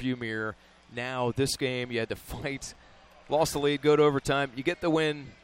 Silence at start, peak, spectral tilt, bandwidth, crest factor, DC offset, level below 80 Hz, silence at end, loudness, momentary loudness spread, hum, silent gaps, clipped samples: 0 s; -12 dBFS; -5 dB/octave; 16 kHz; 16 dB; under 0.1%; -54 dBFS; 0.1 s; -28 LUFS; 12 LU; none; none; under 0.1%